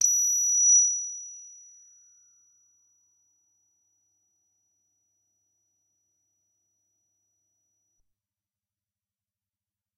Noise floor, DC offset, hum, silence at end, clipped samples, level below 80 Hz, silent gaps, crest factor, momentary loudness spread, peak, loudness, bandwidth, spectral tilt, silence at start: under -90 dBFS; under 0.1%; none; 8.5 s; under 0.1%; under -90 dBFS; none; 22 dB; 23 LU; -10 dBFS; -20 LUFS; 12 kHz; 6.5 dB/octave; 0 s